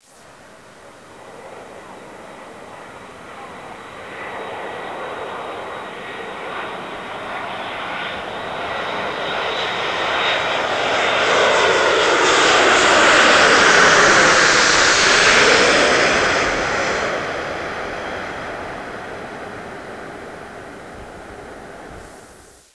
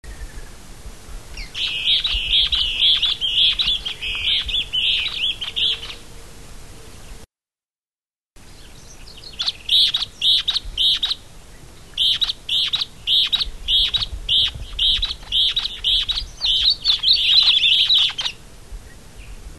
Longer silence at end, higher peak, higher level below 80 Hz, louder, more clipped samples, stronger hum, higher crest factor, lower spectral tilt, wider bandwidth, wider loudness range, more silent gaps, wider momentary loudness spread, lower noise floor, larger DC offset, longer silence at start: first, 0.45 s vs 0 s; first, 0 dBFS vs -4 dBFS; second, -48 dBFS vs -38 dBFS; about the same, -15 LUFS vs -17 LUFS; neither; neither; about the same, 18 dB vs 18 dB; about the same, -1.5 dB/octave vs -0.5 dB/octave; second, 11 kHz vs 13 kHz; first, 22 LU vs 8 LU; second, none vs 7.78-7.82 s; first, 25 LU vs 11 LU; second, -45 dBFS vs under -90 dBFS; second, 0.1% vs 0.6%; first, 0.85 s vs 0.05 s